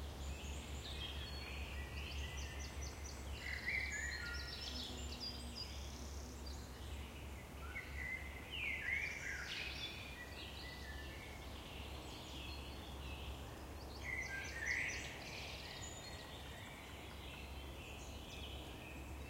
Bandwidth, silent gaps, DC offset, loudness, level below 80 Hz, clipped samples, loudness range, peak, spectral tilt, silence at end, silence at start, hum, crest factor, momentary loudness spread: 16 kHz; none; under 0.1%; -46 LUFS; -52 dBFS; under 0.1%; 6 LU; -28 dBFS; -3.5 dB/octave; 0 s; 0 s; none; 18 dB; 11 LU